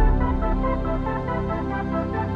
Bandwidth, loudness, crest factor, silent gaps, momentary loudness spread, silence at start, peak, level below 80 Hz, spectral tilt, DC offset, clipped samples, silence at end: 5 kHz; -25 LUFS; 14 dB; none; 3 LU; 0 s; -8 dBFS; -26 dBFS; -9.5 dB/octave; under 0.1%; under 0.1%; 0 s